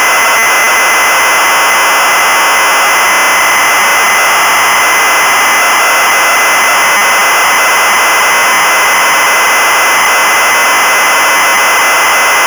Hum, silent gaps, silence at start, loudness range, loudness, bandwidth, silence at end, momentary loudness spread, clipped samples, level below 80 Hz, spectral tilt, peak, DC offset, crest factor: none; none; 0 s; 0 LU; -6 LUFS; over 20 kHz; 0 s; 0 LU; under 0.1%; -52 dBFS; 1 dB/octave; -6 dBFS; under 0.1%; 2 dB